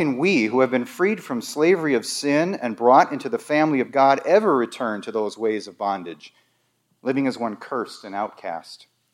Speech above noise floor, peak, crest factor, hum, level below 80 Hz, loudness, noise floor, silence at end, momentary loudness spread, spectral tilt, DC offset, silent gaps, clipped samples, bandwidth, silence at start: 47 dB; -2 dBFS; 20 dB; none; -80 dBFS; -21 LUFS; -68 dBFS; 0.35 s; 13 LU; -5 dB/octave; under 0.1%; none; under 0.1%; 16 kHz; 0 s